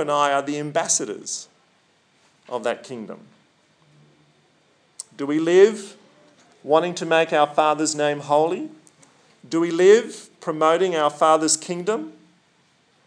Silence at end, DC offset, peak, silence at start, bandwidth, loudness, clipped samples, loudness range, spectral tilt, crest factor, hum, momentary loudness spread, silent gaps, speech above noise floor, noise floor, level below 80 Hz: 0.95 s; under 0.1%; -4 dBFS; 0 s; 10.5 kHz; -20 LUFS; under 0.1%; 14 LU; -3.5 dB/octave; 20 dB; none; 20 LU; none; 41 dB; -61 dBFS; -88 dBFS